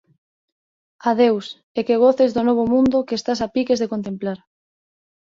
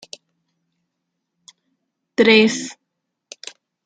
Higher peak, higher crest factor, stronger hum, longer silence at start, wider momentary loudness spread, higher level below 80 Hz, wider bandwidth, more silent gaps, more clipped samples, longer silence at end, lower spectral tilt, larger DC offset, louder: about the same, -4 dBFS vs -2 dBFS; second, 16 dB vs 22 dB; neither; second, 1.05 s vs 2.2 s; second, 11 LU vs 24 LU; first, -56 dBFS vs -68 dBFS; second, 7.6 kHz vs 9.4 kHz; first, 1.63-1.75 s vs none; neither; about the same, 1.05 s vs 1.15 s; first, -6 dB/octave vs -3.5 dB/octave; neither; second, -19 LUFS vs -15 LUFS